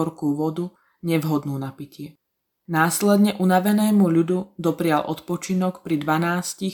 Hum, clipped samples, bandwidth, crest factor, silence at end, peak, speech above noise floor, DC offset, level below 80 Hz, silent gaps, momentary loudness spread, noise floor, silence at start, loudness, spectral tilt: none; under 0.1%; 19 kHz; 18 dB; 0 s; -4 dBFS; 55 dB; under 0.1%; -66 dBFS; none; 15 LU; -76 dBFS; 0 s; -22 LUFS; -6 dB/octave